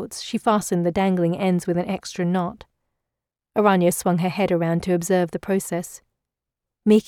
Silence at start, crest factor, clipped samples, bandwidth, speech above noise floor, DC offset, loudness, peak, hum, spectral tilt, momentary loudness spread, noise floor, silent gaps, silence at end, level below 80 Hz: 0 s; 18 dB; under 0.1%; 16 kHz; 64 dB; under 0.1%; -22 LUFS; -4 dBFS; none; -6 dB/octave; 9 LU; -85 dBFS; none; 0.05 s; -56 dBFS